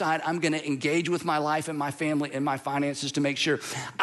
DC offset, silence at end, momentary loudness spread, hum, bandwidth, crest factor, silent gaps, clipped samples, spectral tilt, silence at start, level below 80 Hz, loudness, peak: under 0.1%; 0 s; 3 LU; none; 12.5 kHz; 16 dB; none; under 0.1%; -4.5 dB/octave; 0 s; -72 dBFS; -27 LUFS; -10 dBFS